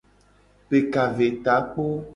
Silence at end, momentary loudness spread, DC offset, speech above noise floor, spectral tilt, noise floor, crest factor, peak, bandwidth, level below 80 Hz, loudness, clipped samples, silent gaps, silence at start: 0 s; 5 LU; under 0.1%; 35 dB; -7.5 dB/octave; -58 dBFS; 18 dB; -6 dBFS; 10.5 kHz; -56 dBFS; -23 LUFS; under 0.1%; none; 0.7 s